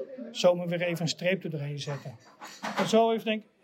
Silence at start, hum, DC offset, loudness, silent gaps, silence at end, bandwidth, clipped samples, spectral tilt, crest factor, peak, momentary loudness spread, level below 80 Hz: 0 s; none; under 0.1%; -29 LUFS; none; 0.2 s; 16 kHz; under 0.1%; -5 dB/octave; 18 dB; -12 dBFS; 15 LU; -90 dBFS